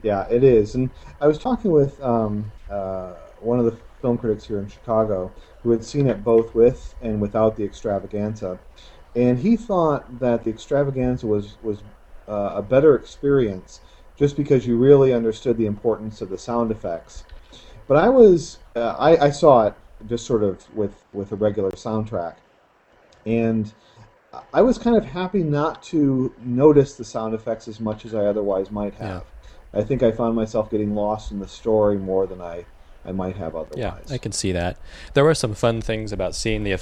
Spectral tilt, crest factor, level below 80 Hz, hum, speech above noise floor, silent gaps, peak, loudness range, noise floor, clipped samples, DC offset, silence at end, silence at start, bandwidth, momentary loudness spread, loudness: -7 dB/octave; 20 dB; -42 dBFS; none; 37 dB; none; 0 dBFS; 7 LU; -57 dBFS; under 0.1%; under 0.1%; 0 s; 0.05 s; 11 kHz; 15 LU; -21 LUFS